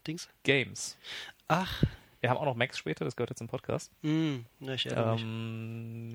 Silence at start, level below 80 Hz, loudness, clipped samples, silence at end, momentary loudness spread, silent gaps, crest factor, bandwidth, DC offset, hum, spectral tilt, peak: 0.05 s; -54 dBFS; -33 LUFS; under 0.1%; 0 s; 11 LU; none; 24 dB; over 20 kHz; under 0.1%; none; -5 dB/octave; -10 dBFS